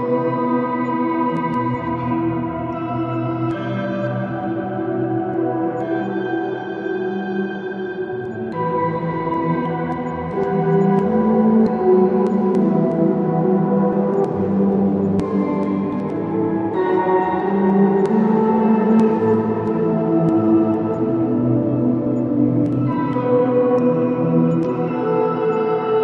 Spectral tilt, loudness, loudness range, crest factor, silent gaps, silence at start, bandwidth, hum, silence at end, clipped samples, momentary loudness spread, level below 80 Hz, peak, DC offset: -10 dB/octave; -19 LUFS; 6 LU; 14 dB; none; 0 s; 5.6 kHz; none; 0 s; under 0.1%; 8 LU; -54 dBFS; -4 dBFS; under 0.1%